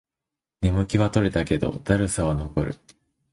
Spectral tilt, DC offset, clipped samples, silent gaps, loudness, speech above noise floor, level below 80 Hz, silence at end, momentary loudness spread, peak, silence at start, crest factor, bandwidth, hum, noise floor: -6.5 dB/octave; under 0.1%; under 0.1%; none; -24 LUFS; 65 dB; -38 dBFS; 0.6 s; 6 LU; -4 dBFS; 0.6 s; 20 dB; 11.5 kHz; none; -88 dBFS